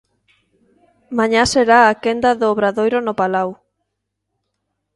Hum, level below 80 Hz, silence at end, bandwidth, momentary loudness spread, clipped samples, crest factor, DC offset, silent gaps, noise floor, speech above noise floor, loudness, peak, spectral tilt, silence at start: 50 Hz at -50 dBFS; -50 dBFS; 1.4 s; 11.5 kHz; 9 LU; under 0.1%; 18 dB; under 0.1%; none; -76 dBFS; 61 dB; -16 LUFS; 0 dBFS; -4 dB/octave; 1.1 s